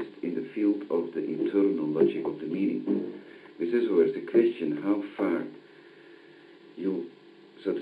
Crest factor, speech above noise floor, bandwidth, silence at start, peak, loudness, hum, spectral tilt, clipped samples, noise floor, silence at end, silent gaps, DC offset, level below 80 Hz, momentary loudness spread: 18 dB; 25 dB; 5 kHz; 0 s; -10 dBFS; -28 LUFS; none; -9 dB/octave; under 0.1%; -52 dBFS; 0 s; none; under 0.1%; -80 dBFS; 12 LU